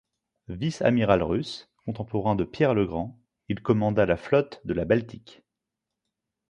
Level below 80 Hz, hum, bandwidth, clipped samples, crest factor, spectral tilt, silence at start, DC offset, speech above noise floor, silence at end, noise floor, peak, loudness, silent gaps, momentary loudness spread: -50 dBFS; none; 10 kHz; under 0.1%; 22 dB; -7.5 dB/octave; 0.5 s; under 0.1%; 61 dB; 1.35 s; -86 dBFS; -4 dBFS; -25 LUFS; none; 14 LU